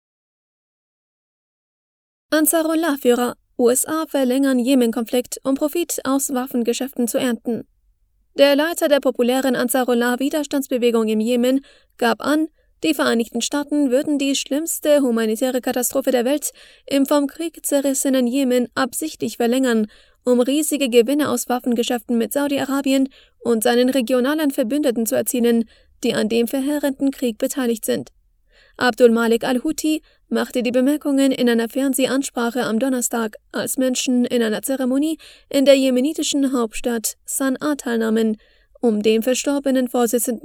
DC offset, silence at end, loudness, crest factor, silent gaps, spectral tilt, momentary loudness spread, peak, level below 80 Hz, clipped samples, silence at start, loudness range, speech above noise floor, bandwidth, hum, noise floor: under 0.1%; 0.05 s; -19 LUFS; 20 dB; none; -3 dB/octave; 6 LU; 0 dBFS; -56 dBFS; under 0.1%; 2.3 s; 2 LU; 42 dB; 20 kHz; none; -61 dBFS